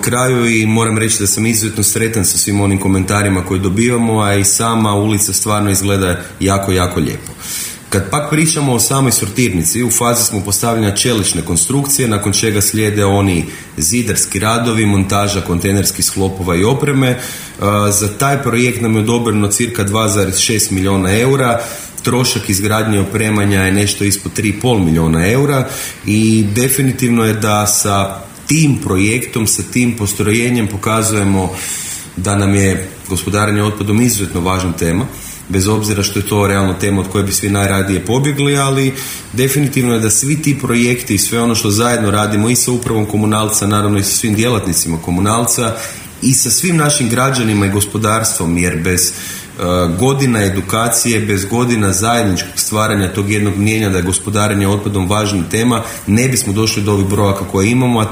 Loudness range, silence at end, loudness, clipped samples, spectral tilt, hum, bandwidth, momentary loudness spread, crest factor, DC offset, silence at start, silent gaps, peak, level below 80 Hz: 2 LU; 0 s; -13 LUFS; under 0.1%; -4.5 dB/octave; none; 16.5 kHz; 5 LU; 14 dB; under 0.1%; 0 s; none; 0 dBFS; -40 dBFS